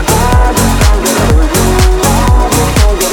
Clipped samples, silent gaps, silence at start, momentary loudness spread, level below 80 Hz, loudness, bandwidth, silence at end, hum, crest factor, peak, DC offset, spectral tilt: under 0.1%; none; 0 s; 1 LU; -10 dBFS; -9 LUFS; 19.5 kHz; 0 s; none; 8 dB; 0 dBFS; under 0.1%; -4.5 dB/octave